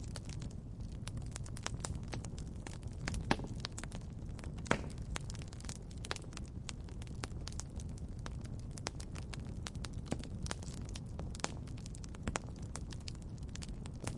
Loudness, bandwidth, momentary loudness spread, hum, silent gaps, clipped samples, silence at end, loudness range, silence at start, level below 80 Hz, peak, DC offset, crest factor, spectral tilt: -44 LUFS; 11.5 kHz; 9 LU; none; none; under 0.1%; 0 s; 4 LU; 0 s; -48 dBFS; -8 dBFS; under 0.1%; 34 dB; -4.5 dB/octave